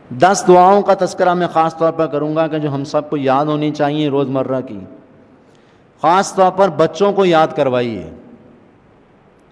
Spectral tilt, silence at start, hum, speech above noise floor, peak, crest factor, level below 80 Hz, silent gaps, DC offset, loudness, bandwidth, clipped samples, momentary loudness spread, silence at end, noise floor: -5.5 dB/octave; 0.1 s; none; 34 dB; 0 dBFS; 16 dB; -56 dBFS; none; under 0.1%; -14 LUFS; 11 kHz; 0.1%; 10 LU; 1.15 s; -48 dBFS